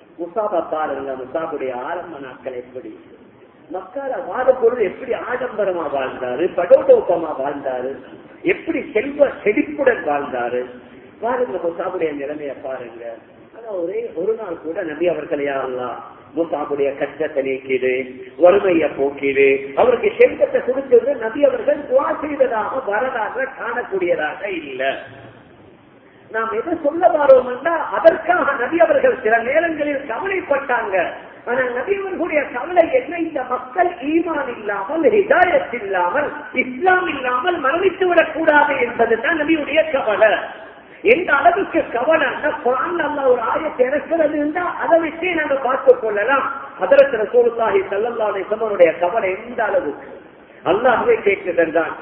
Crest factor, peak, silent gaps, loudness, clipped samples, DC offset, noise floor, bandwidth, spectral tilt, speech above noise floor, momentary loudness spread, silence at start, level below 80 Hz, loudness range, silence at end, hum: 18 dB; 0 dBFS; none; -18 LUFS; under 0.1%; under 0.1%; -47 dBFS; 4.1 kHz; -8.5 dB/octave; 29 dB; 12 LU; 0.2 s; -56 dBFS; 8 LU; 0 s; none